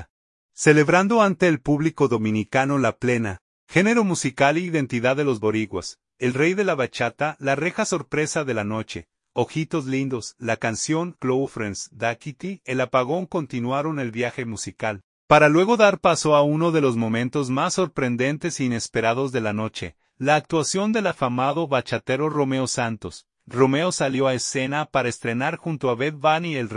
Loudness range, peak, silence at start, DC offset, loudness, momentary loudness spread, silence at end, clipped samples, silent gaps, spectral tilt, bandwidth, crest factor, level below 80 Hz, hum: 6 LU; -2 dBFS; 0 s; under 0.1%; -22 LUFS; 11 LU; 0 s; under 0.1%; 0.10-0.49 s, 3.41-3.67 s, 15.04-15.28 s; -5 dB/octave; 11 kHz; 20 dB; -58 dBFS; none